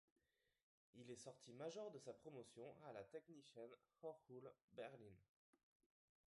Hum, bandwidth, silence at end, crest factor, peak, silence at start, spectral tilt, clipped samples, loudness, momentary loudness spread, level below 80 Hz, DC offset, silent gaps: none; 11 kHz; 1.05 s; 18 dB; -42 dBFS; 0.95 s; -5 dB/octave; under 0.1%; -60 LUFS; 8 LU; under -90 dBFS; under 0.1%; 4.64-4.68 s